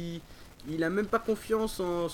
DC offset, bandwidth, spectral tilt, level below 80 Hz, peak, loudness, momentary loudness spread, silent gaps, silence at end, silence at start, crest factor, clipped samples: under 0.1%; 18 kHz; -5.5 dB/octave; -52 dBFS; -14 dBFS; -31 LUFS; 12 LU; none; 0 s; 0 s; 18 dB; under 0.1%